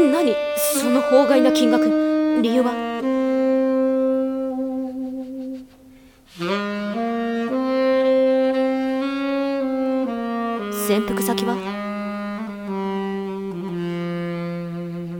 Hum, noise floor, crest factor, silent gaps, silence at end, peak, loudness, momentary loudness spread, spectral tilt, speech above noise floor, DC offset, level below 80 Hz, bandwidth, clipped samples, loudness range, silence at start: none; -48 dBFS; 18 dB; none; 0 s; -4 dBFS; -21 LUFS; 11 LU; -5 dB/octave; 30 dB; under 0.1%; -56 dBFS; 18 kHz; under 0.1%; 8 LU; 0 s